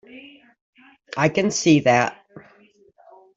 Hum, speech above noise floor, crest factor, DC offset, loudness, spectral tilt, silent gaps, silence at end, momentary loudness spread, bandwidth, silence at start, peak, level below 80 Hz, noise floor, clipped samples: none; 37 dB; 20 dB; under 0.1%; -19 LUFS; -4.5 dB/octave; 0.61-0.73 s; 0.95 s; 10 LU; 8 kHz; 0.15 s; -4 dBFS; -62 dBFS; -55 dBFS; under 0.1%